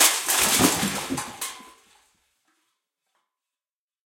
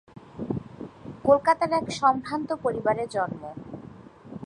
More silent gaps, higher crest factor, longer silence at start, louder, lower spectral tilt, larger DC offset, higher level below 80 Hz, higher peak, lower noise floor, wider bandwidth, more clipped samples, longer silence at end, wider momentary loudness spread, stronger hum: neither; about the same, 24 dB vs 20 dB; second, 0 s vs 0.15 s; first, -22 LUFS vs -25 LUFS; second, -1.5 dB/octave vs -6 dB/octave; neither; about the same, -56 dBFS vs -58 dBFS; first, -2 dBFS vs -6 dBFS; first, under -90 dBFS vs -46 dBFS; first, 16.5 kHz vs 11 kHz; neither; first, 2.5 s vs 0 s; second, 16 LU vs 21 LU; neither